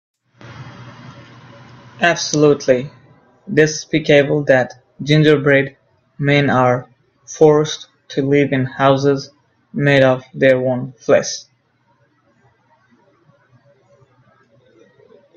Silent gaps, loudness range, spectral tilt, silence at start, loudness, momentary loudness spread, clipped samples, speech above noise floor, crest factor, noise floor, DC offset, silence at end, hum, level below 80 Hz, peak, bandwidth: none; 5 LU; -5.5 dB/octave; 0.45 s; -15 LUFS; 17 LU; under 0.1%; 46 dB; 18 dB; -60 dBFS; under 0.1%; 3.95 s; none; -56 dBFS; 0 dBFS; 8 kHz